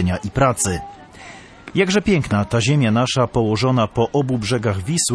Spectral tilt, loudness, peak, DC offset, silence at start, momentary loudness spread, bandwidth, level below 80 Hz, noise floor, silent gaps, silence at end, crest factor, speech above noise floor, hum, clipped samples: -5 dB/octave; -18 LUFS; -2 dBFS; under 0.1%; 0 s; 21 LU; 11 kHz; -40 dBFS; -40 dBFS; none; 0 s; 16 dB; 22 dB; none; under 0.1%